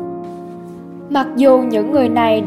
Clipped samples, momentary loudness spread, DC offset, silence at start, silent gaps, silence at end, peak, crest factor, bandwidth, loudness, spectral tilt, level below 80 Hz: under 0.1%; 21 LU; under 0.1%; 0 s; none; 0 s; 0 dBFS; 16 dB; 14.5 kHz; -14 LUFS; -7 dB/octave; -58 dBFS